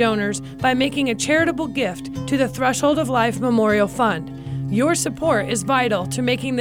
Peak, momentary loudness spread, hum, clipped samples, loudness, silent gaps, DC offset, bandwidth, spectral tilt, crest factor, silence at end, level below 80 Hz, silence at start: -6 dBFS; 6 LU; none; under 0.1%; -20 LUFS; none; under 0.1%; 17 kHz; -4.5 dB/octave; 14 dB; 0 s; -48 dBFS; 0 s